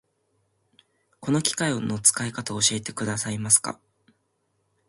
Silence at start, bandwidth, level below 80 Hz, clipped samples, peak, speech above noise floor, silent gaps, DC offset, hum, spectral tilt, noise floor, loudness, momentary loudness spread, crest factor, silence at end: 1.2 s; 12 kHz; -62 dBFS; under 0.1%; -4 dBFS; 48 dB; none; under 0.1%; none; -2.5 dB/octave; -73 dBFS; -23 LUFS; 11 LU; 24 dB; 1.15 s